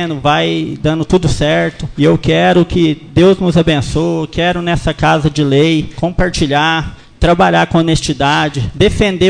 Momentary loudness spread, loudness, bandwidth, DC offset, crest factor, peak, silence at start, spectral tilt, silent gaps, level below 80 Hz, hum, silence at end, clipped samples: 6 LU; -12 LUFS; 10 kHz; under 0.1%; 12 dB; 0 dBFS; 0 s; -6 dB/octave; none; -28 dBFS; none; 0 s; under 0.1%